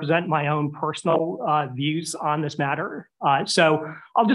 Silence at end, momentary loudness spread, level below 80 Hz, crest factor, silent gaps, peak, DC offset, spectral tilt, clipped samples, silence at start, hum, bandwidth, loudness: 0 s; 7 LU; -72 dBFS; 16 dB; none; -6 dBFS; under 0.1%; -5 dB/octave; under 0.1%; 0 s; none; 12.5 kHz; -23 LUFS